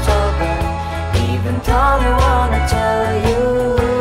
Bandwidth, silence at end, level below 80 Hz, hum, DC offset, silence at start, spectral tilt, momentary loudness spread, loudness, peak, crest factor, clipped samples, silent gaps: 15.5 kHz; 0 s; -20 dBFS; none; under 0.1%; 0 s; -6 dB/octave; 5 LU; -16 LUFS; -2 dBFS; 12 dB; under 0.1%; none